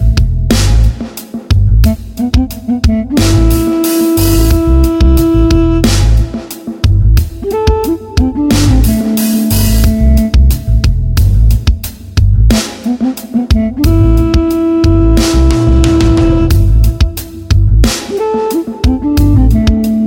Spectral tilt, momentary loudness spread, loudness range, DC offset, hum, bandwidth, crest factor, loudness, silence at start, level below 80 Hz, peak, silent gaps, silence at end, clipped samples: -6.5 dB/octave; 6 LU; 2 LU; under 0.1%; none; 17 kHz; 8 dB; -11 LUFS; 0 s; -12 dBFS; 0 dBFS; none; 0 s; under 0.1%